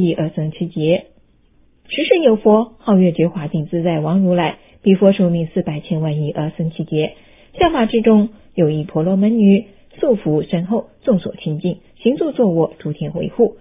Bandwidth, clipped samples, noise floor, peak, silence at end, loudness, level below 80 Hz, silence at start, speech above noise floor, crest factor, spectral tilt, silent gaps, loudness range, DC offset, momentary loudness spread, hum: 3.8 kHz; under 0.1%; -53 dBFS; 0 dBFS; 0.1 s; -17 LUFS; -48 dBFS; 0 s; 37 dB; 16 dB; -12 dB/octave; none; 3 LU; under 0.1%; 10 LU; none